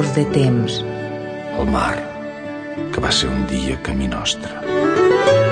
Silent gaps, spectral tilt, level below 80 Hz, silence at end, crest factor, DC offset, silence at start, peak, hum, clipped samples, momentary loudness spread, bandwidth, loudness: none; -5 dB/octave; -34 dBFS; 0 s; 16 dB; under 0.1%; 0 s; -2 dBFS; none; under 0.1%; 13 LU; 10.5 kHz; -19 LUFS